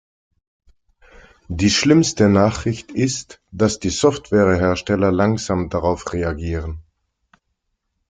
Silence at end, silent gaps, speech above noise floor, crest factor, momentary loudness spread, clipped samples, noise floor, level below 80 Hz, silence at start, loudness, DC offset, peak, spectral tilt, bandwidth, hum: 1.3 s; none; 55 dB; 18 dB; 12 LU; under 0.1%; -73 dBFS; -42 dBFS; 1.5 s; -18 LUFS; under 0.1%; -2 dBFS; -5 dB/octave; 9.6 kHz; none